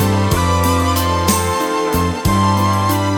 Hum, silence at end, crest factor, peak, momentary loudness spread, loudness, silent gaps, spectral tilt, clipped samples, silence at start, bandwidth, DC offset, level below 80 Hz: none; 0 s; 14 dB; 0 dBFS; 3 LU; -15 LUFS; none; -5 dB/octave; under 0.1%; 0 s; 19.5 kHz; under 0.1%; -30 dBFS